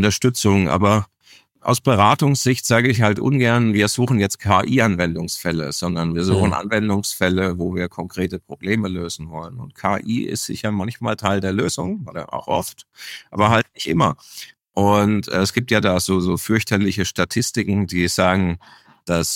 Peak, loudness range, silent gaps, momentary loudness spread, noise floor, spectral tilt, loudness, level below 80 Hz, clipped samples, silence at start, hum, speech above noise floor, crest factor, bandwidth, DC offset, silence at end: -2 dBFS; 6 LU; none; 12 LU; -52 dBFS; -5 dB/octave; -19 LUFS; -46 dBFS; under 0.1%; 0 s; none; 33 dB; 16 dB; 17 kHz; under 0.1%; 0 s